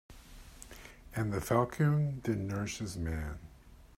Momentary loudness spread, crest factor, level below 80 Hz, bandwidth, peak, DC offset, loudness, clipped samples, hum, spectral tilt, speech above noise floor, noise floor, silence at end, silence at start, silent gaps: 22 LU; 20 dB; -52 dBFS; 16 kHz; -14 dBFS; under 0.1%; -34 LUFS; under 0.1%; none; -6.5 dB/octave; 23 dB; -56 dBFS; 0.1 s; 0.1 s; none